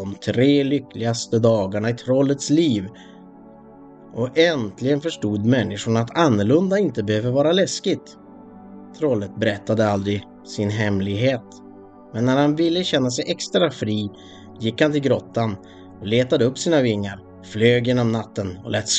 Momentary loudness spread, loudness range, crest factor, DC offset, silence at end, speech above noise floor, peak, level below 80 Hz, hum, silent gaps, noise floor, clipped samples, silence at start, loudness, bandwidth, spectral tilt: 10 LU; 3 LU; 20 dB; under 0.1%; 0 s; 24 dB; 0 dBFS; -58 dBFS; none; none; -44 dBFS; under 0.1%; 0 s; -21 LUFS; 9.2 kHz; -5.5 dB/octave